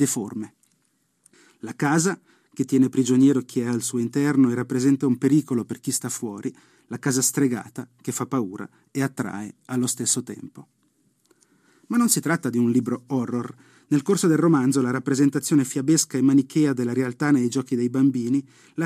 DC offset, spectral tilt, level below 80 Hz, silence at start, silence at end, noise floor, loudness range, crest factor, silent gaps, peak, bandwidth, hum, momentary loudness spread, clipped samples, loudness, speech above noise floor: under 0.1%; -5 dB/octave; -72 dBFS; 0 s; 0 s; -69 dBFS; 7 LU; 18 dB; none; -6 dBFS; 15 kHz; none; 15 LU; under 0.1%; -22 LUFS; 47 dB